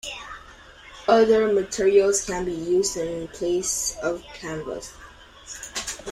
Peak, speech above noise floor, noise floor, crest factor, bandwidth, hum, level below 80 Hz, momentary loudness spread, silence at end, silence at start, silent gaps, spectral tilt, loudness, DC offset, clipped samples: -4 dBFS; 24 dB; -46 dBFS; 20 dB; 15 kHz; none; -50 dBFS; 18 LU; 0 s; 0.05 s; none; -3 dB/octave; -23 LUFS; under 0.1%; under 0.1%